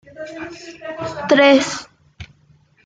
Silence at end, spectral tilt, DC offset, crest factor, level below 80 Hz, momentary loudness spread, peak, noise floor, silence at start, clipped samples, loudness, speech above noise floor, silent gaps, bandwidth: 0.6 s; -3.5 dB/octave; under 0.1%; 18 dB; -56 dBFS; 22 LU; 0 dBFS; -54 dBFS; 0.15 s; under 0.1%; -15 LUFS; 37 dB; none; 9.4 kHz